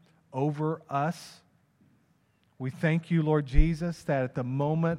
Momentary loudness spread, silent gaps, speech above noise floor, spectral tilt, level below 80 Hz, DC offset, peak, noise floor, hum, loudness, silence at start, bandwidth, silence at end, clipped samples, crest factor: 12 LU; none; 41 dB; -8 dB/octave; -34 dBFS; under 0.1%; -6 dBFS; -68 dBFS; none; -29 LUFS; 0.35 s; 11.5 kHz; 0 s; under 0.1%; 22 dB